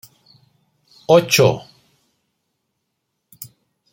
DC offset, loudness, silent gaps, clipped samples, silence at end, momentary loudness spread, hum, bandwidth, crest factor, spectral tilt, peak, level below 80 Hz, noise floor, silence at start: under 0.1%; -15 LUFS; none; under 0.1%; 0.5 s; 25 LU; none; 16.5 kHz; 20 dB; -4.5 dB/octave; -2 dBFS; -60 dBFS; -75 dBFS; 1.1 s